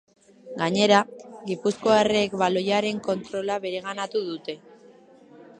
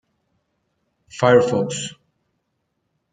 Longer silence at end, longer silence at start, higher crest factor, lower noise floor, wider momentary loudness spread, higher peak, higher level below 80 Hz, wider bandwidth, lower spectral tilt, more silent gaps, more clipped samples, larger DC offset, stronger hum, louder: second, 0.15 s vs 1.2 s; second, 0.45 s vs 1.15 s; about the same, 22 dB vs 22 dB; second, -51 dBFS vs -73 dBFS; second, 15 LU vs 18 LU; about the same, -4 dBFS vs -2 dBFS; about the same, -64 dBFS vs -62 dBFS; about the same, 10 kHz vs 9.4 kHz; about the same, -4.5 dB/octave vs -5 dB/octave; neither; neither; neither; neither; second, -24 LUFS vs -18 LUFS